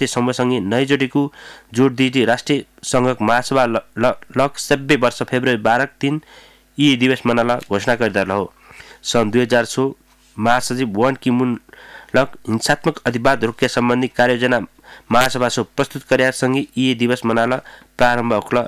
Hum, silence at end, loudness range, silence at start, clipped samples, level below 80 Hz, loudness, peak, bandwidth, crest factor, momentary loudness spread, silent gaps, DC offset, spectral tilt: none; 0 s; 2 LU; 0 s; under 0.1%; -50 dBFS; -18 LUFS; -4 dBFS; 15.5 kHz; 14 dB; 6 LU; none; under 0.1%; -5 dB/octave